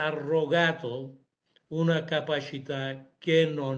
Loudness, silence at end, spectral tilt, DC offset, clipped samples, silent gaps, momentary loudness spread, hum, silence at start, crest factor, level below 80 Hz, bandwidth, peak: -28 LUFS; 0 s; -6.5 dB/octave; under 0.1%; under 0.1%; none; 12 LU; none; 0 s; 18 dB; -72 dBFS; 7.6 kHz; -10 dBFS